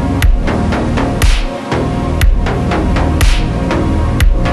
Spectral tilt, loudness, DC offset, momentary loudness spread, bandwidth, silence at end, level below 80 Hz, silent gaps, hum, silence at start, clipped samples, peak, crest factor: -6 dB/octave; -14 LUFS; under 0.1%; 3 LU; 13.5 kHz; 0 s; -14 dBFS; none; none; 0 s; under 0.1%; 0 dBFS; 10 dB